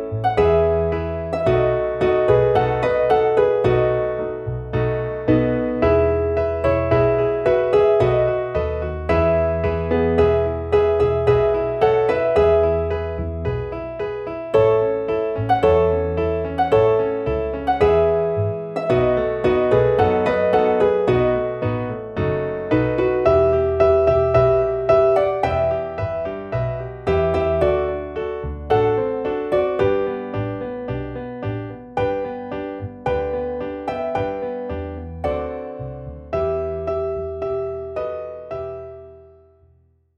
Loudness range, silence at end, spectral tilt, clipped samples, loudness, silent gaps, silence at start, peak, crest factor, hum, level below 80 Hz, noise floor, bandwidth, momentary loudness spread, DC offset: 8 LU; 1 s; -8.5 dB/octave; under 0.1%; -20 LUFS; none; 0 s; -4 dBFS; 16 dB; none; -36 dBFS; -57 dBFS; 6.6 kHz; 11 LU; under 0.1%